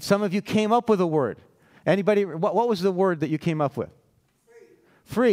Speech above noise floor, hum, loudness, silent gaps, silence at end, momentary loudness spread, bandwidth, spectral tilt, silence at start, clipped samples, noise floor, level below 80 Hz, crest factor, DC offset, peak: 42 dB; none; -24 LUFS; none; 0 s; 10 LU; 16 kHz; -6.5 dB/octave; 0 s; under 0.1%; -64 dBFS; -64 dBFS; 16 dB; under 0.1%; -8 dBFS